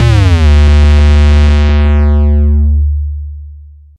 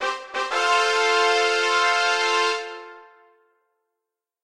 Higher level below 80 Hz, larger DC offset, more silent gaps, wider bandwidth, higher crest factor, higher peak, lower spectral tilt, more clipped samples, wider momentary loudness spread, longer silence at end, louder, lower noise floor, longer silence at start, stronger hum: first, -8 dBFS vs -74 dBFS; neither; neither; second, 7.4 kHz vs 12.5 kHz; second, 8 dB vs 16 dB; first, 0 dBFS vs -6 dBFS; first, -7.5 dB/octave vs 2 dB/octave; neither; first, 13 LU vs 10 LU; second, 0.4 s vs 1.4 s; first, -9 LUFS vs -20 LUFS; second, -32 dBFS vs -84 dBFS; about the same, 0 s vs 0 s; neither